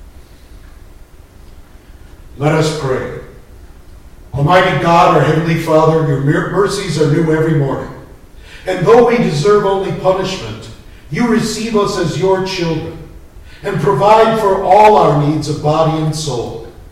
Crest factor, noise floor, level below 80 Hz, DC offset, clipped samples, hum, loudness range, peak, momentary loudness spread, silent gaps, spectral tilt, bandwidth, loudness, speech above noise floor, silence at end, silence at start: 14 dB; -38 dBFS; -36 dBFS; under 0.1%; under 0.1%; none; 9 LU; 0 dBFS; 15 LU; none; -6 dB/octave; 14.5 kHz; -13 LUFS; 26 dB; 0.05 s; 0 s